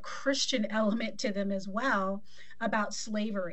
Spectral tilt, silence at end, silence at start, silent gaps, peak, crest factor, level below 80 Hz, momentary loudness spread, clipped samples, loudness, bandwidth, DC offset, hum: -4 dB/octave; 0 s; 0.05 s; none; -16 dBFS; 16 dB; -68 dBFS; 5 LU; under 0.1%; -32 LUFS; 8.4 kHz; 1%; none